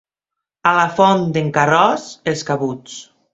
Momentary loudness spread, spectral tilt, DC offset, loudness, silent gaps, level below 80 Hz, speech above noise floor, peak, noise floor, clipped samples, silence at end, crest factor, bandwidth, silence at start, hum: 14 LU; -5 dB/octave; under 0.1%; -16 LUFS; none; -58 dBFS; 67 dB; 0 dBFS; -83 dBFS; under 0.1%; 0.3 s; 18 dB; 8 kHz; 0.65 s; none